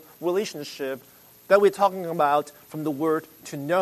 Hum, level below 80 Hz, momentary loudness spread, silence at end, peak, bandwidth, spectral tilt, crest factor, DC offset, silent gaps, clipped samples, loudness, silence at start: none; -74 dBFS; 15 LU; 0 s; -4 dBFS; 13.5 kHz; -5 dB/octave; 20 dB; under 0.1%; none; under 0.1%; -24 LUFS; 0.2 s